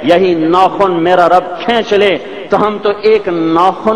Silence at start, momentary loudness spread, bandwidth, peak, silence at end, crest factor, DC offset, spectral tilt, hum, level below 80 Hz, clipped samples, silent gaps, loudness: 0 s; 4 LU; 10 kHz; 0 dBFS; 0 s; 10 dB; 0.9%; -6 dB/octave; none; -46 dBFS; under 0.1%; none; -11 LUFS